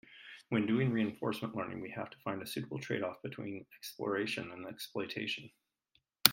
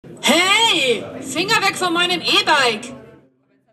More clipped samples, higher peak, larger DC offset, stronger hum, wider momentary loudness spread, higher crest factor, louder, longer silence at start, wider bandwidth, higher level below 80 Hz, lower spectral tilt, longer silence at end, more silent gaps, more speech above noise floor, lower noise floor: neither; about the same, 0 dBFS vs -2 dBFS; neither; neither; about the same, 13 LU vs 11 LU; first, 38 dB vs 16 dB; second, -37 LUFS vs -15 LUFS; about the same, 0.1 s vs 0.05 s; about the same, 16.5 kHz vs 15 kHz; second, -76 dBFS vs -62 dBFS; first, -4 dB/octave vs -1.5 dB/octave; second, 0 s vs 0.65 s; neither; about the same, 39 dB vs 40 dB; first, -77 dBFS vs -58 dBFS